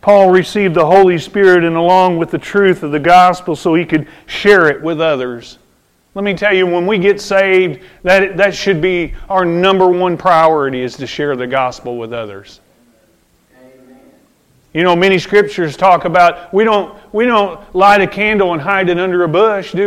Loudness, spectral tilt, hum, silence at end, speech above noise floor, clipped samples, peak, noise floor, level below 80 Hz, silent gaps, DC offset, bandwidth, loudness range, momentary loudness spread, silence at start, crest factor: -12 LUFS; -6 dB/octave; none; 0 s; 43 dB; under 0.1%; 0 dBFS; -54 dBFS; -42 dBFS; none; under 0.1%; 13 kHz; 8 LU; 10 LU; 0.05 s; 12 dB